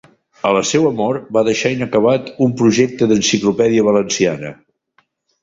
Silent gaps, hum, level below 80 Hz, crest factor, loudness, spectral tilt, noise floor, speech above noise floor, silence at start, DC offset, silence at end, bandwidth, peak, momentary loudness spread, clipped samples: none; none; -52 dBFS; 14 dB; -15 LUFS; -4.5 dB/octave; -61 dBFS; 46 dB; 0.45 s; under 0.1%; 0.9 s; 7.8 kHz; -2 dBFS; 5 LU; under 0.1%